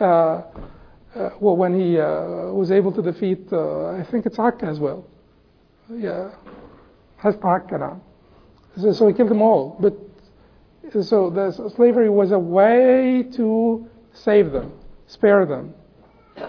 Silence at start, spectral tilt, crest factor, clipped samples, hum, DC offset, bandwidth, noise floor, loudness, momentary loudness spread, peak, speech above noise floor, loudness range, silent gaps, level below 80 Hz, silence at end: 0 s; -9 dB/octave; 16 dB; under 0.1%; none; under 0.1%; 5.4 kHz; -56 dBFS; -19 LUFS; 14 LU; -4 dBFS; 37 dB; 9 LU; none; -52 dBFS; 0 s